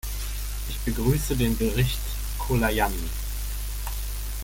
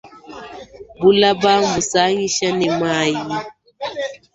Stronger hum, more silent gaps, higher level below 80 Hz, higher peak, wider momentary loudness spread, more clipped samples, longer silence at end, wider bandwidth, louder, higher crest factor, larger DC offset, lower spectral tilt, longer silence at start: first, 50 Hz at -30 dBFS vs none; neither; first, -30 dBFS vs -54 dBFS; second, -8 dBFS vs -2 dBFS; second, 8 LU vs 22 LU; neither; second, 0 s vs 0.2 s; first, 17 kHz vs 8 kHz; second, -27 LUFS vs -17 LUFS; about the same, 18 dB vs 18 dB; neither; first, -5 dB/octave vs -3.5 dB/octave; about the same, 0.05 s vs 0.05 s